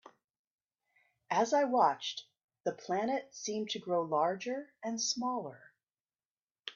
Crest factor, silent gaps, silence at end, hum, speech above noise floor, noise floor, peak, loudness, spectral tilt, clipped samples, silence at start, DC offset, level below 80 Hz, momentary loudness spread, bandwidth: 20 dB; 0.24-0.28 s, 0.39-0.58 s, 2.44-2.48 s, 6.00-6.04 s, 6.25-6.55 s; 0.05 s; none; over 57 dB; under -90 dBFS; -16 dBFS; -34 LUFS; -3 dB/octave; under 0.1%; 0.05 s; under 0.1%; -84 dBFS; 11 LU; 7.6 kHz